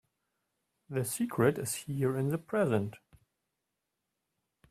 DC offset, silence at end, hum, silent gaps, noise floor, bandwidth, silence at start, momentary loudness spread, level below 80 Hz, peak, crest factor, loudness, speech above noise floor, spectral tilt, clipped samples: under 0.1%; 1.75 s; none; none; -86 dBFS; 15.5 kHz; 0.9 s; 7 LU; -70 dBFS; -14 dBFS; 22 dB; -32 LUFS; 54 dB; -6 dB/octave; under 0.1%